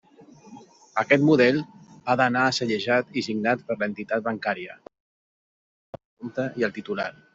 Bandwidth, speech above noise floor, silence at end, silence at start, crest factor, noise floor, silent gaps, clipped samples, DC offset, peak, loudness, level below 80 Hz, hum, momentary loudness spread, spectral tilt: 7.8 kHz; 27 dB; 0.25 s; 0.2 s; 22 dB; -51 dBFS; 5.00-5.93 s, 6.05-6.17 s; under 0.1%; under 0.1%; -4 dBFS; -24 LUFS; -68 dBFS; none; 14 LU; -5.5 dB/octave